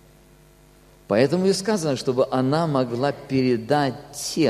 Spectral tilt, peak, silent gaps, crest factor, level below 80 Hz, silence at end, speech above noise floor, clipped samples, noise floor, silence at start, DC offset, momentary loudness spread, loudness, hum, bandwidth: -5.5 dB/octave; -4 dBFS; none; 18 dB; -56 dBFS; 0 s; 31 dB; under 0.1%; -52 dBFS; 1.1 s; under 0.1%; 5 LU; -22 LUFS; none; 14.5 kHz